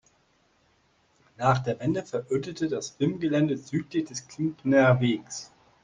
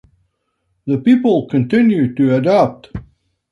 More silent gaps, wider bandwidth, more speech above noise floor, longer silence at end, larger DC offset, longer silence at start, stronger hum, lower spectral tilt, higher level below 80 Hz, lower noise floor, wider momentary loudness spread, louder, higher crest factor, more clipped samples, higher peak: neither; first, 9.6 kHz vs 6.4 kHz; second, 40 dB vs 55 dB; about the same, 0.4 s vs 0.5 s; neither; first, 1.4 s vs 0.85 s; neither; second, -6 dB/octave vs -8.5 dB/octave; second, -60 dBFS vs -48 dBFS; about the same, -66 dBFS vs -68 dBFS; second, 11 LU vs 19 LU; second, -27 LUFS vs -14 LUFS; first, 20 dB vs 14 dB; neither; second, -8 dBFS vs -2 dBFS